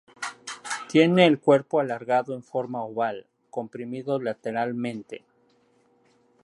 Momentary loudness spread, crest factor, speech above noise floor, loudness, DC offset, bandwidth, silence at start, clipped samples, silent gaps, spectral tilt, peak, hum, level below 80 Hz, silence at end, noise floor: 18 LU; 22 dB; 40 dB; -25 LUFS; under 0.1%; 11.5 kHz; 0.2 s; under 0.1%; none; -5.5 dB/octave; -4 dBFS; none; -76 dBFS; 1.25 s; -64 dBFS